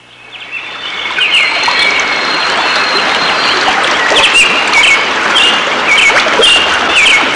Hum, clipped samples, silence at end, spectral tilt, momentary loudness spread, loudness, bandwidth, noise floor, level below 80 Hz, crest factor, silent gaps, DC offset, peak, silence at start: none; under 0.1%; 0 s; -0.5 dB/octave; 10 LU; -7 LUFS; 11.5 kHz; -30 dBFS; -44 dBFS; 10 dB; none; under 0.1%; 0 dBFS; 0.2 s